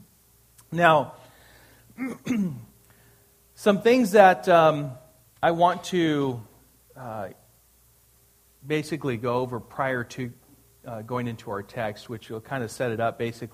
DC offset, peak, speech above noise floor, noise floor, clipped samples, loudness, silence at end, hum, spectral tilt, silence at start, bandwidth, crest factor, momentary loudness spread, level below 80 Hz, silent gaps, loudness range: under 0.1%; -2 dBFS; 36 dB; -60 dBFS; under 0.1%; -24 LUFS; 0.05 s; none; -6 dB/octave; 0.7 s; 15.5 kHz; 24 dB; 18 LU; -62 dBFS; none; 11 LU